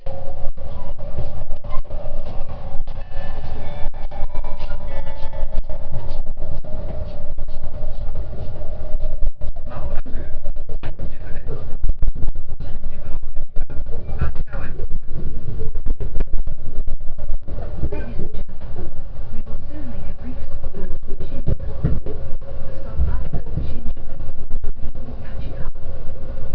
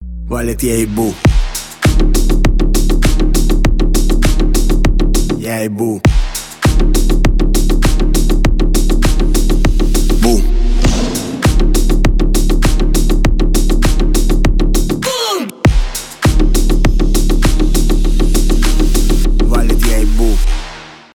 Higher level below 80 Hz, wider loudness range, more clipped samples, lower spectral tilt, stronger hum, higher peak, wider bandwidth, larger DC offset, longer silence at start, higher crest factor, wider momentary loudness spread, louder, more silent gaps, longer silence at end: second, -20 dBFS vs -12 dBFS; first, 4 LU vs 1 LU; neither; first, -9.5 dB/octave vs -5 dB/octave; neither; about the same, 0 dBFS vs 0 dBFS; second, 1.8 kHz vs 16.5 kHz; neither; about the same, 0 s vs 0 s; about the same, 12 dB vs 10 dB; first, 7 LU vs 3 LU; second, -31 LUFS vs -14 LUFS; neither; second, 0 s vs 0.2 s